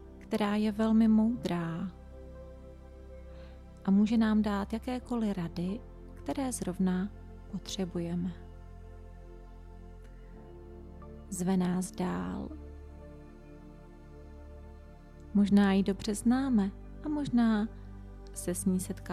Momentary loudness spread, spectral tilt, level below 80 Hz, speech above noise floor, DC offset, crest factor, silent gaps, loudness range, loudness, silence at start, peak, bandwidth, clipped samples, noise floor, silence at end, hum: 25 LU; -6.5 dB/octave; -50 dBFS; 21 dB; under 0.1%; 18 dB; none; 11 LU; -31 LUFS; 0 s; -16 dBFS; 14 kHz; under 0.1%; -50 dBFS; 0 s; none